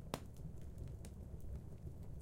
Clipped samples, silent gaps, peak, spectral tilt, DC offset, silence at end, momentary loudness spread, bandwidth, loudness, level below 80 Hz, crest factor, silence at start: under 0.1%; none; -22 dBFS; -6 dB/octave; under 0.1%; 0 s; 4 LU; 16.5 kHz; -52 LUFS; -54 dBFS; 28 dB; 0 s